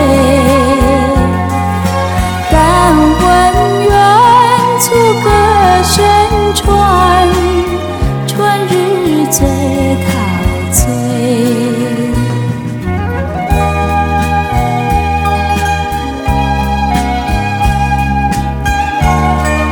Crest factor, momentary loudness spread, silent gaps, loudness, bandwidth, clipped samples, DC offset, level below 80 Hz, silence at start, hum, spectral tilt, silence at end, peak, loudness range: 10 dB; 7 LU; none; -10 LUFS; 19 kHz; 0.3%; under 0.1%; -20 dBFS; 0 s; none; -5 dB/octave; 0 s; 0 dBFS; 6 LU